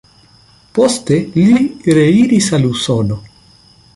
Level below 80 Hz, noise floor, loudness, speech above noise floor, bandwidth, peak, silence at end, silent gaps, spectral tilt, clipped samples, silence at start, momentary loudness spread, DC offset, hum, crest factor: -44 dBFS; -47 dBFS; -13 LUFS; 35 dB; 11.5 kHz; -2 dBFS; 0.75 s; none; -6 dB/octave; under 0.1%; 0.75 s; 8 LU; under 0.1%; none; 12 dB